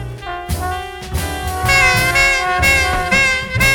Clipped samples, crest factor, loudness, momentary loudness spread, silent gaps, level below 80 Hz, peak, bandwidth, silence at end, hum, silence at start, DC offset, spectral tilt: under 0.1%; 16 dB; -14 LUFS; 13 LU; none; -28 dBFS; 0 dBFS; 20 kHz; 0 s; none; 0 s; under 0.1%; -3 dB/octave